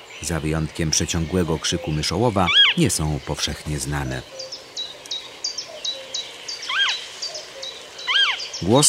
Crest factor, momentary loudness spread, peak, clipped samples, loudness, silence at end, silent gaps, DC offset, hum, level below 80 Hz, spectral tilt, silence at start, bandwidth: 20 dB; 14 LU; -2 dBFS; under 0.1%; -22 LUFS; 0 s; none; under 0.1%; none; -40 dBFS; -3 dB/octave; 0 s; 16 kHz